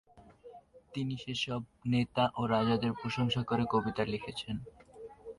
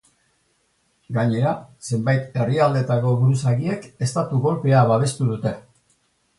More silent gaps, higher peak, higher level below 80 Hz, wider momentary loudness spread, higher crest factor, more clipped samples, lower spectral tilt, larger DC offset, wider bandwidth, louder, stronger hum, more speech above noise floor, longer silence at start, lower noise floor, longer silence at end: neither; second, -16 dBFS vs -4 dBFS; about the same, -60 dBFS vs -56 dBFS; first, 14 LU vs 10 LU; about the same, 18 dB vs 16 dB; neither; about the same, -6.5 dB/octave vs -7 dB/octave; neither; about the same, 11 kHz vs 11.5 kHz; second, -33 LUFS vs -21 LUFS; neither; second, 23 dB vs 46 dB; second, 0.15 s vs 1.1 s; second, -55 dBFS vs -66 dBFS; second, 0.05 s vs 0.8 s